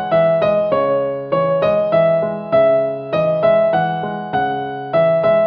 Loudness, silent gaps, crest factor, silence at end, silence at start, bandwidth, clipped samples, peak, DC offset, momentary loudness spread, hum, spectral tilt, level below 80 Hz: -16 LUFS; none; 12 dB; 0 s; 0 s; 5 kHz; under 0.1%; -4 dBFS; under 0.1%; 6 LU; none; -9 dB/octave; -52 dBFS